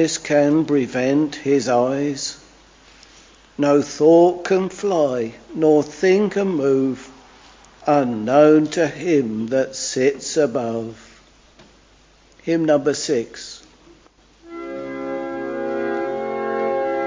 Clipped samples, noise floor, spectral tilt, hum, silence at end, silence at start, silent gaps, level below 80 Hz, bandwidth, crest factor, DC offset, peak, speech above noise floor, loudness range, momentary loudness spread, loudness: under 0.1%; -52 dBFS; -5 dB/octave; none; 0 s; 0 s; none; -58 dBFS; 7.6 kHz; 20 dB; under 0.1%; 0 dBFS; 34 dB; 7 LU; 15 LU; -19 LUFS